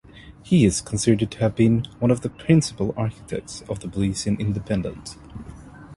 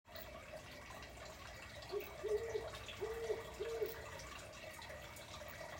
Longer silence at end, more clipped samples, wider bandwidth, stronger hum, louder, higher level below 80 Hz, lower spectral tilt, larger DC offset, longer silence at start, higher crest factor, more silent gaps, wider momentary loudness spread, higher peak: about the same, 0 s vs 0 s; neither; second, 11.5 kHz vs 16.5 kHz; neither; first, -22 LUFS vs -47 LUFS; first, -44 dBFS vs -62 dBFS; first, -6 dB/octave vs -4 dB/octave; neither; about the same, 0.15 s vs 0.05 s; about the same, 18 dB vs 18 dB; neither; first, 18 LU vs 10 LU; first, -4 dBFS vs -30 dBFS